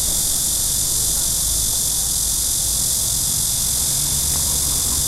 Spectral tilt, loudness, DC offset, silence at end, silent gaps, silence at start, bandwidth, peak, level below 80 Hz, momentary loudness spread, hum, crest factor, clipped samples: -1 dB/octave; -16 LUFS; under 0.1%; 0 s; none; 0 s; 16 kHz; -4 dBFS; -32 dBFS; 0 LU; none; 14 dB; under 0.1%